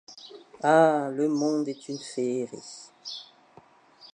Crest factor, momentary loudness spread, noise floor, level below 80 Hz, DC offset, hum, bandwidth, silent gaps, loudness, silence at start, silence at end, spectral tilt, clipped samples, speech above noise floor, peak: 20 dB; 23 LU; -56 dBFS; -82 dBFS; under 0.1%; none; 10.5 kHz; none; -26 LUFS; 0.1 s; 0.1 s; -5 dB/octave; under 0.1%; 31 dB; -8 dBFS